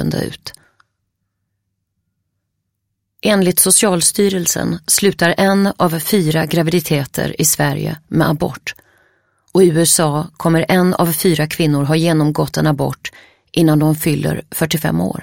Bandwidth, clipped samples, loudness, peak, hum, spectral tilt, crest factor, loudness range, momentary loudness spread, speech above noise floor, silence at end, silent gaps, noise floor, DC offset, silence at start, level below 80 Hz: 17 kHz; under 0.1%; -14 LUFS; 0 dBFS; none; -4.5 dB/octave; 16 dB; 4 LU; 10 LU; 58 dB; 0 s; none; -73 dBFS; under 0.1%; 0 s; -46 dBFS